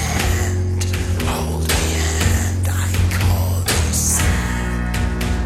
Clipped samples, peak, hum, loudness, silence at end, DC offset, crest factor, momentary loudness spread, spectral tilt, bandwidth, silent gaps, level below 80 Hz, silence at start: under 0.1%; -4 dBFS; none; -19 LUFS; 0 s; under 0.1%; 14 dB; 5 LU; -4 dB/octave; 16 kHz; none; -24 dBFS; 0 s